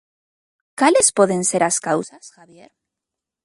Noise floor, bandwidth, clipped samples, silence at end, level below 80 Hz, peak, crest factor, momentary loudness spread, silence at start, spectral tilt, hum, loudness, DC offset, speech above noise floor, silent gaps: -85 dBFS; 11.5 kHz; under 0.1%; 1.15 s; -64 dBFS; -2 dBFS; 20 dB; 15 LU; 0.8 s; -3 dB/octave; none; -17 LUFS; under 0.1%; 66 dB; none